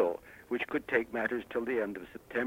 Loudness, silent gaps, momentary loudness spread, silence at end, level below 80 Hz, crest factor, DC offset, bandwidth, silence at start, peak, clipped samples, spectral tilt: -34 LUFS; none; 8 LU; 0 s; -66 dBFS; 20 dB; under 0.1%; 16 kHz; 0 s; -14 dBFS; under 0.1%; -6 dB/octave